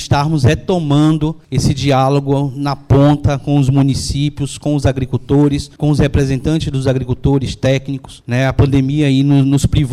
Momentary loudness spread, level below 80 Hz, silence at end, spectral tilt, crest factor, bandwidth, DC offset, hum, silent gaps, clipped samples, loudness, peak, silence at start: 6 LU; -30 dBFS; 0 s; -7 dB/octave; 10 dB; 12 kHz; under 0.1%; none; none; under 0.1%; -14 LUFS; -4 dBFS; 0 s